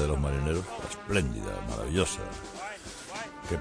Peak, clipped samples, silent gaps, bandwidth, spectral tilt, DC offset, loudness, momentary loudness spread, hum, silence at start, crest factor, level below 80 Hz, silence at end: -12 dBFS; under 0.1%; none; 11 kHz; -5 dB/octave; under 0.1%; -33 LUFS; 11 LU; none; 0 s; 20 dB; -38 dBFS; 0 s